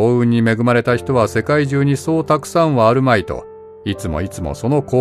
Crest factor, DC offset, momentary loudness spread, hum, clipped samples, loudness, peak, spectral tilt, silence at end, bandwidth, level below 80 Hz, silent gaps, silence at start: 14 dB; under 0.1%; 11 LU; none; under 0.1%; -16 LUFS; 0 dBFS; -7 dB/octave; 0 s; 14 kHz; -40 dBFS; none; 0 s